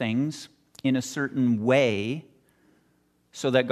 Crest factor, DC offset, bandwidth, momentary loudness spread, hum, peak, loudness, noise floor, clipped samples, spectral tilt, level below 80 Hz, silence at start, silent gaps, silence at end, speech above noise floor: 20 dB; under 0.1%; 13.5 kHz; 17 LU; none; -6 dBFS; -26 LUFS; -67 dBFS; under 0.1%; -5.5 dB/octave; -70 dBFS; 0 s; none; 0 s; 42 dB